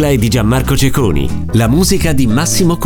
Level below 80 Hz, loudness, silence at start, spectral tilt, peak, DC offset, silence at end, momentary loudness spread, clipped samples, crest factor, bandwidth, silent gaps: -22 dBFS; -12 LUFS; 0 s; -5 dB/octave; 0 dBFS; under 0.1%; 0 s; 4 LU; under 0.1%; 10 dB; over 20 kHz; none